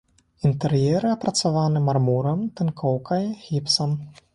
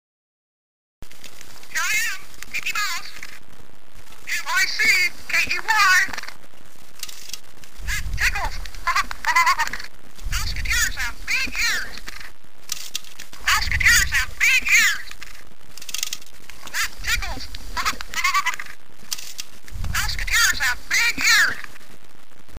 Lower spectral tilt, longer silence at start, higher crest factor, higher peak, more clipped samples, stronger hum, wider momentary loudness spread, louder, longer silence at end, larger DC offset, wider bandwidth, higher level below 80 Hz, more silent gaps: first, -6 dB/octave vs 0 dB/octave; second, 0.45 s vs 1 s; about the same, 16 dB vs 20 dB; about the same, -6 dBFS vs -4 dBFS; neither; neither; second, 6 LU vs 22 LU; second, -23 LUFS vs -20 LUFS; first, 0.25 s vs 0 s; second, under 0.1% vs 5%; second, 11.5 kHz vs 15.5 kHz; second, -56 dBFS vs -36 dBFS; neither